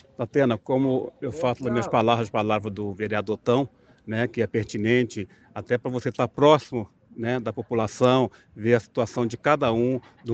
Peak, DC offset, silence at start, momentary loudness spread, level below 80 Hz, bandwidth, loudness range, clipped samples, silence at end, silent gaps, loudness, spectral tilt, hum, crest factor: -4 dBFS; under 0.1%; 0.2 s; 11 LU; -60 dBFS; 8.4 kHz; 3 LU; under 0.1%; 0 s; none; -24 LUFS; -6.5 dB/octave; none; 20 dB